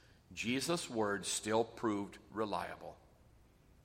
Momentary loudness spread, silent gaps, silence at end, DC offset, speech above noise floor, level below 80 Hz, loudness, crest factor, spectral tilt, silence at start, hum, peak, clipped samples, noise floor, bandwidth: 12 LU; none; 0.9 s; under 0.1%; 27 dB; -68 dBFS; -38 LUFS; 20 dB; -3.5 dB/octave; 0.3 s; none; -20 dBFS; under 0.1%; -65 dBFS; 16 kHz